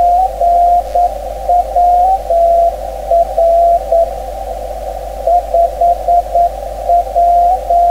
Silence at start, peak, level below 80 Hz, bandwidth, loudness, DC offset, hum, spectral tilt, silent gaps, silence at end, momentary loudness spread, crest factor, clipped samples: 0 s; 0 dBFS; -28 dBFS; 15.5 kHz; -12 LUFS; under 0.1%; none; -5.5 dB/octave; none; 0 s; 13 LU; 10 dB; under 0.1%